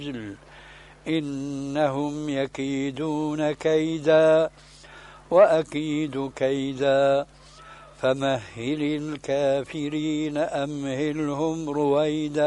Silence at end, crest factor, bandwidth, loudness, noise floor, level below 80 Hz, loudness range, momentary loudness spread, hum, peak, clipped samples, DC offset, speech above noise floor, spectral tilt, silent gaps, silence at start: 0 s; 18 dB; 11.5 kHz; -24 LUFS; -47 dBFS; -56 dBFS; 5 LU; 11 LU; none; -6 dBFS; under 0.1%; under 0.1%; 23 dB; -6 dB/octave; none; 0 s